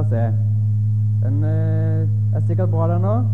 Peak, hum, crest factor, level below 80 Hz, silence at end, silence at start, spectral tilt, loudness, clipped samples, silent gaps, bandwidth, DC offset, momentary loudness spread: -8 dBFS; none; 10 dB; -48 dBFS; 0 s; 0 s; -11.5 dB/octave; -19 LUFS; under 0.1%; none; 2 kHz; 2%; 1 LU